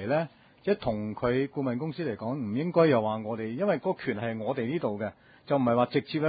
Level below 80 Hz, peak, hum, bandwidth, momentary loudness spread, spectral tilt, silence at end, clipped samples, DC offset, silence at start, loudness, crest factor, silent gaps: -60 dBFS; -8 dBFS; none; 5 kHz; 9 LU; -11 dB/octave; 0 s; under 0.1%; under 0.1%; 0 s; -29 LUFS; 20 dB; none